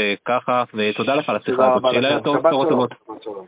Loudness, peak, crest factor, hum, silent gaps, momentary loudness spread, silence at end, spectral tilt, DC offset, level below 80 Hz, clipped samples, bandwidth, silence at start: -19 LUFS; -2 dBFS; 16 dB; none; none; 5 LU; 0.05 s; -9 dB/octave; under 0.1%; -64 dBFS; under 0.1%; 4 kHz; 0 s